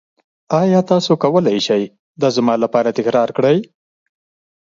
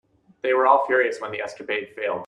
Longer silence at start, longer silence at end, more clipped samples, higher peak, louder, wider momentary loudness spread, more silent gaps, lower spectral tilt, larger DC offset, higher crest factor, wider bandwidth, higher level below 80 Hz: about the same, 0.5 s vs 0.45 s; first, 1 s vs 0 s; neither; first, 0 dBFS vs -4 dBFS; first, -16 LUFS vs -22 LUFS; second, 5 LU vs 13 LU; first, 1.99-2.15 s vs none; first, -6.5 dB/octave vs -4 dB/octave; neither; about the same, 16 dB vs 20 dB; second, 7.6 kHz vs 10.5 kHz; first, -62 dBFS vs -72 dBFS